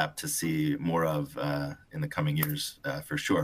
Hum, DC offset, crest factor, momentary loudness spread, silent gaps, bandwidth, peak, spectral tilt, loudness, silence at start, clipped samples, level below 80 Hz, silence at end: none; under 0.1%; 22 dB; 6 LU; none; 16 kHz; -10 dBFS; -5 dB/octave; -31 LUFS; 0 s; under 0.1%; -58 dBFS; 0 s